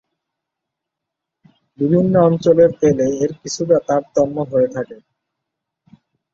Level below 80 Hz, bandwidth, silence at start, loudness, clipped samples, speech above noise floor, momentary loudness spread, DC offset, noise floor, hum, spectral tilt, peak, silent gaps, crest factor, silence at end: -54 dBFS; 7.6 kHz; 1.8 s; -16 LUFS; under 0.1%; 66 dB; 10 LU; under 0.1%; -81 dBFS; none; -7 dB/octave; -2 dBFS; none; 16 dB; 1.4 s